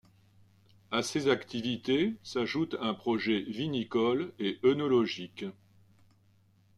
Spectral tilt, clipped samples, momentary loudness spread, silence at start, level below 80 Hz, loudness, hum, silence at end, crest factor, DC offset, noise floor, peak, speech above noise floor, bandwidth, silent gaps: -5 dB/octave; under 0.1%; 7 LU; 0.9 s; -70 dBFS; -31 LUFS; none; 1.25 s; 20 dB; under 0.1%; -65 dBFS; -12 dBFS; 35 dB; 12 kHz; none